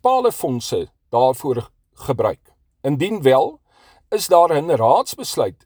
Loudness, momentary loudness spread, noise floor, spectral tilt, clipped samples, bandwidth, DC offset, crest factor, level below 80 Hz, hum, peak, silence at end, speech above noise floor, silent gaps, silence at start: -19 LUFS; 11 LU; -54 dBFS; -5 dB/octave; under 0.1%; over 20 kHz; under 0.1%; 18 dB; -56 dBFS; none; 0 dBFS; 0.15 s; 36 dB; none; 0.05 s